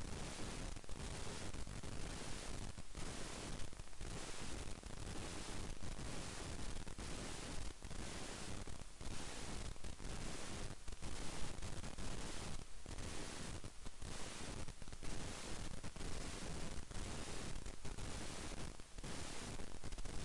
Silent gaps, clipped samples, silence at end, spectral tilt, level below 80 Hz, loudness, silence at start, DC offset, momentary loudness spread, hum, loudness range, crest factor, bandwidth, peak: none; under 0.1%; 0 s; -3.5 dB/octave; -52 dBFS; -50 LUFS; 0 s; under 0.1%; 4 LU; none; 1 LU; 16 dB; 11.5 kHz; -28 dBFS